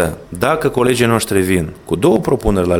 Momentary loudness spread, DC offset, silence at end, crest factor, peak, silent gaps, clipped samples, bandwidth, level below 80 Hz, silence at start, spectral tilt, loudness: 6 LU; under 0.1%; 0 s; 14 dB; 0 dBFS; none; under 0.1%; 17.5 kHz; -32 dBFS; 0 s; -5.5 dB/octave; -15 LUFS